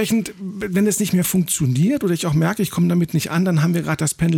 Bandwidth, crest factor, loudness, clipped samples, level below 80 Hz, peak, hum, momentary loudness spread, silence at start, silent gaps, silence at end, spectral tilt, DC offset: 17.5 kHz; 10 dB; -19 LUFS; under 0.1%; -48 dBFS; -8 dBFS; none; 4 LU; 0 s; none; 0 s; -5.5 dB/octave; under 0.1%